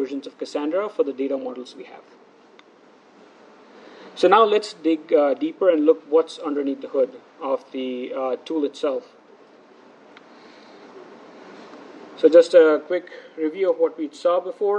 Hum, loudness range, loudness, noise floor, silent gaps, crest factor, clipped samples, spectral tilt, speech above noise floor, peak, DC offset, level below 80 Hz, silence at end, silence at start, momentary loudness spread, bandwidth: none; 11 LU; -21 LUFS; -52 dBFS; none; 20 dB; under 0.1%; -4.5 dB/octave; 31 dB; -2 dBFS; under 0.1%; -84 dBFS; 0 s; 0 s; 23 LU; 9.4 kHz